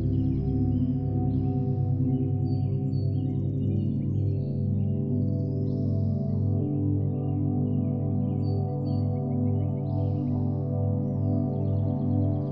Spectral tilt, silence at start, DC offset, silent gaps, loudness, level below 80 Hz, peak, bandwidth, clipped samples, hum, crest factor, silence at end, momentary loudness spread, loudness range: -13 dB/octave; 0 s; under 0.1%; none; -27 LUFS; -46 dBFS; -14 dBFS; 4.8 kHz; under 0.1%; 50 Hz at -30 dBFS; 12 dB; 0 s; 2 LU; 1 LU